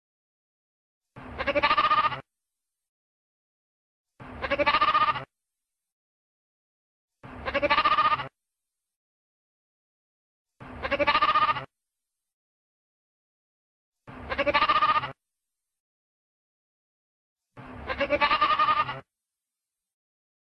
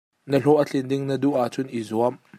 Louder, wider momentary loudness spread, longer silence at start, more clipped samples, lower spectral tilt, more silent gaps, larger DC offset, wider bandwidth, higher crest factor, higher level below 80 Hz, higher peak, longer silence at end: about the same, -24 LUFS vs -23 LUFS; first, 18 LU vs 7 LU; first, 1.15 s vs 0.25 s; neither; second, -5 dB/octave vs -7 dB/octave; first, 2.88-4.05 s, 5.92-7.08 s, 8.96-10.46 s, 12.33-13.92 s, 15.80-17.36 s vs none; neither; second, 6.2 kHz vs 15 kHz; about the same, 22 dB vs 18 dB; first, -54 dBFS vs -68 dBFS; about the same, -8 dBFS vs -6 dBFS; first, 1.5 s vs 0 s